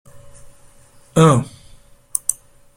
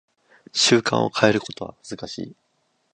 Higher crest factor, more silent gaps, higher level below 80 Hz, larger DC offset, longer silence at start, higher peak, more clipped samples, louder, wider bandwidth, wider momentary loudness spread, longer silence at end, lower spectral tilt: about the same, 20 dB vs 24 dB; neither; first, -48 dBFS vs -60 dBFS; neither; second, 0.15 s vs 0.55 s; about the same, 0 dBFS vs 0 dBFS; neither; first, -17 LUFS vs -20 LUFS; first, 16.5 kHz vs 11 kHz; about the same, 19 LU vs 18 LU; second, 0.45 s vs 0.6 s; first, -5.5 dB/octave vs -3.5 dB/octave